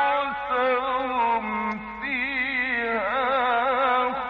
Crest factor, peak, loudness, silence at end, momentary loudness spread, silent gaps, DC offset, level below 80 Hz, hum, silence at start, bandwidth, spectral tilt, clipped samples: 14 dB; -12 dBFS; -24 LUFS; 0 s; 6 LU; none; under 0.1%; -54 dBFS; none; 0 s; 6.4 kHz; -6 dB/octave; under 0.1%